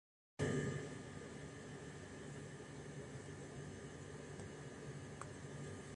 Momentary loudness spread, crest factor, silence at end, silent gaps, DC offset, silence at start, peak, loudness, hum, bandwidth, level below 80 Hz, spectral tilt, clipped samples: 10 LU; 20 dB; 0 s; none; under 0.1%; 0.4 s; -28 dBFS; -49 LUFS; none; 11.5 kHz; -66 dBFS; -5.5 dB/octave; under 0.1%